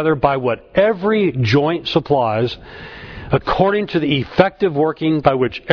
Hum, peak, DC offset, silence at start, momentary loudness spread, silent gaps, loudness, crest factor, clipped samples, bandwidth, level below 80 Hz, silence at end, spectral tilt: none; 0 dBFS; under 0.1%; 0 s; 7 LU; none; -17 LUFS; 16 dB; under 0.1%; 5.4 kHz; -42 dBFS; 0 s; -7.5 dB/octave